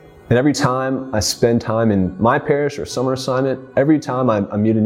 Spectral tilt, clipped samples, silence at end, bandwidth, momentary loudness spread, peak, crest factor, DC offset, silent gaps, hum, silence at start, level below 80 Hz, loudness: -5.5 dB/octave; under 0.1%; 0 s; 16.5 kHz; 5 LU; -2 dBFS; 14 dB; under 0.1%; none; none; 0.3 s; -46 dBFS; -18 LUFS